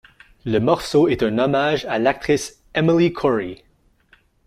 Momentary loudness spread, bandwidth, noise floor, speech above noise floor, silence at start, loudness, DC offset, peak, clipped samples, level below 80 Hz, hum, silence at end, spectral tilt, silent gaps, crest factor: 7 LU; 15 kHz; -57 dBFS; 39 dB; 0.45 s; -19 LUFS; under 0.1%; -2 dBFS; under 0.1%; -48 dBFS; none; 0.9 s; -6 dB/octave; none; 18 dB